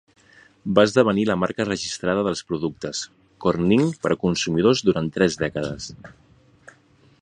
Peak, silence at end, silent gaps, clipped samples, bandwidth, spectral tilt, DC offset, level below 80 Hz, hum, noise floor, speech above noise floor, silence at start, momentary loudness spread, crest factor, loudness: -2 dBFS; 1.15 s; none; under 0.1%; 10.5 kHz; -5.5 dB/octave; under 0.1%; -52 dBFS; none; -56 dBFS; 35 dB; 0.65 s; 12 LU; 22 dB; -22 LUFS